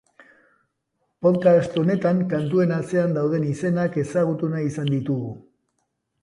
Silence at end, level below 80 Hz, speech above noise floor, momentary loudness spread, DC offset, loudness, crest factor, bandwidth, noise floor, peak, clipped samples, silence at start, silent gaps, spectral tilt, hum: 0.8 s; -62 dBFS; 53 dB; 7 LU; under 0.1%; -22 LUFS; 18 dB; 11 kHz; -74 dBFS; -6 dBFS; under 0.1%; 1.2 s; none; -8 dB/octave; none